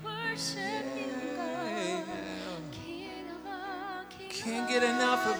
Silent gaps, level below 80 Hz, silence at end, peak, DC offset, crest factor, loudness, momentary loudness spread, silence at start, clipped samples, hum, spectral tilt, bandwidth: none; -66 dBFS; 0 s; -12 dBFS; under 0.1%; 22 dB; -34 LUFS; 14 LU; 0 s; under 0.1%; none; -3.5 dB/octave; over 20 kHz